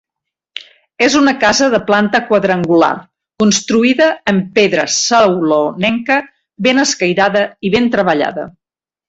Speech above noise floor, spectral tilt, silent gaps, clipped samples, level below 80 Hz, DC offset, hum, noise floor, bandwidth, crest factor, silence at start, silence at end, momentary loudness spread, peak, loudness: 75 dB; -3.5 dB/octave; none; under 0.1%; -52 dBFS; under 0.1%; none; -87 dBFS; 8.2 kHz; 14 dB; 0.55 s; 0.6 s; 6 LU; 0 dBFS; -12 LUFS